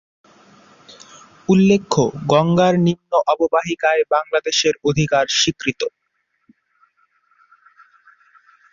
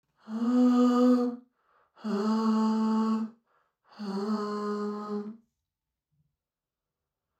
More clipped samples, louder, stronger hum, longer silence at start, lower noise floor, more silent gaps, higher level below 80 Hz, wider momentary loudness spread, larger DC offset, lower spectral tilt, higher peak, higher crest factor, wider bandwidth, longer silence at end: neither; first, -17 LUFS vs -28 LUFS; neither; first, 1.5 s vs 0.25 s; second, -70 dBFS vs under -90 dBFS; neither; first, -54 dBFS vs -88 dBFS; second, 6 LU vs 17 LU; neither; second, -4.5 dB/octave vs -7 dB/octave; first, -2 dBFS vs -14 dBFS; about the same, 18 dB vs 16 dB; second, 7.4 kHz vs 8.4 kHz; first, 2.85 s vs 2.05 s